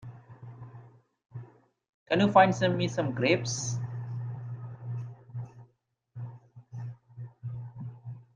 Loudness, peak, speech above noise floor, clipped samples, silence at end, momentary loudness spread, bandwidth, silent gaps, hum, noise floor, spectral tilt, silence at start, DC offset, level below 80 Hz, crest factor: -29 LUFS; -6 dBFS; 46 dB; under 0.1%; 0.15 s; 24 LU; 9.8 kHz; 1.89-2.06 s; none; -71 dBFS; -5.5 dB/octave; 0 s; under 0.1%; -68 dBFS; 24 dB